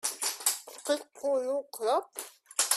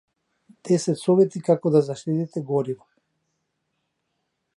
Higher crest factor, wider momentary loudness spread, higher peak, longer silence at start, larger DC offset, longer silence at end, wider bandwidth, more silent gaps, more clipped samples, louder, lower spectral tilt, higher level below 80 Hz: about the same, 22 dB vs 18 dB; second, 7 LU vs 10 LU; second, -10 dBFS vs -6 dBFS; second, 0.05 s vs 0.65 s; neither; second, 0 s vs 1.8 s; first, 16 kHz vs 11.5 kHz; neither; neither; second, -31 LUFS vs -22 LUFS; second, 1.5 dB/octave vs -7.5 dB/octave; second, -84 dBFS vs -74 dBFS